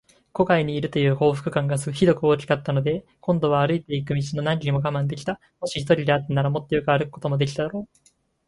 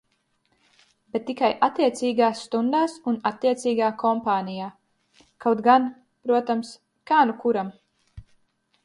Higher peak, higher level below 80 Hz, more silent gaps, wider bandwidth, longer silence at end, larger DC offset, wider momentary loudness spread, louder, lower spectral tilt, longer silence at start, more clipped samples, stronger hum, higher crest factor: about the same, -6 dBFS vs -6 dBFS; first, -52 dBFS vs -62 dBFS; neither; about the same, 11.5 kHz vs 11.5 kHz; about the same, 0.65 s vs 0.65 s; neither; second, 9 LU vs 12 LU; about the same, -23 LUFS vs -23 LUFS; first, -6.5 dB/octave vs -5 dB/octave; second, 0.35 s vs 1.15 s; neither; neither; about the same, 18 dB vs 20 dB